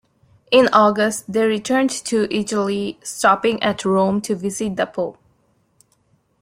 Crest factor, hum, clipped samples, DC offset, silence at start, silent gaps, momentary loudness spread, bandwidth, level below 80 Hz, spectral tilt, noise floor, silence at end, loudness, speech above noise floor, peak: 20 dB; none; under 0.1%; under 0.1%; 0.5 s; none; 9 LU; 16 kHz; -60 dBFS; -4 dB/octave; -62 dBFS; 1.3 s; -19 LUFS; 44 dB; 0 dBFS